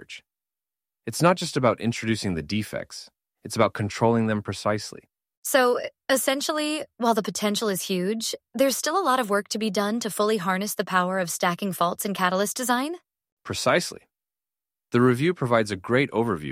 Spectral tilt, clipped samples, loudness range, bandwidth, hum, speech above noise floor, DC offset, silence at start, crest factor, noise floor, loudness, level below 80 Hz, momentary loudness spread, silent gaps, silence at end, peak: -4.5 dB/octave; under 0.1%; 2 LU; 16 kHz; none; over 66 dB; under 0.1%; 0 s; 20 dB; under -90 dBFS; -24 LUFS; -60 dBFS; 11 LU; 5.37-5.43 s, 13.32-13.37 s; 0 s; -4 dBFS